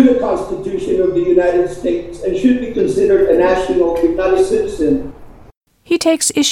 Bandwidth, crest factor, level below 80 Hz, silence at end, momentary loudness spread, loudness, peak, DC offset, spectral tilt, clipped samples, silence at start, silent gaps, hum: 16 kHz; 14 dB; -38 dBFS; 0 s; 8 LU; -15 LUFS; 0 dBFS; under 0.1%; -4 dB/octave; under 0.1%; 0 s; 5.57-5.61 s; none